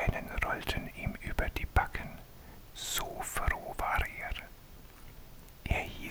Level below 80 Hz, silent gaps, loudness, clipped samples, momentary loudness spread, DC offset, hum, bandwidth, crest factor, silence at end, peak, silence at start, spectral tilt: -40 dBFS; none; -35 LUFS; under 0.1%; 21 LU; under 0.1%; none; 19 kHz; 22 dB; 0 s; -12 dBFS; 0 s; -4 dB/octave